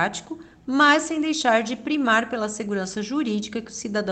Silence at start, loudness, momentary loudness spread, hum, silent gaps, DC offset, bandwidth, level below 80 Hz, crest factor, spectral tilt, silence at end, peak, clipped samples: 0 s; -23 LUFS; 14 LU; none; none; under 0.1%; 9.2 kHz; -62 dBFS; 18 dB; -3.5 dB/octave; 0 s; -4 dBFS; under 0.1%